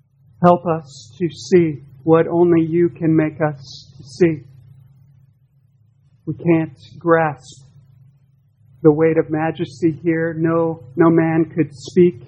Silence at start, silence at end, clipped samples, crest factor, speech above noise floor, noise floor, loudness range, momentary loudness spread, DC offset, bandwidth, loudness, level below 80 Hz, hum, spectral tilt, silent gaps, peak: 0.4 s; 0 s; under 0.1%; 18 dB; 39 dB; -56 dBFS; 6 LU; 14 LU; under 0.1%; 8.2 kHz; -17 LUFS; -58 dBFS; none; -8 dB/octave; none; 0 dBFS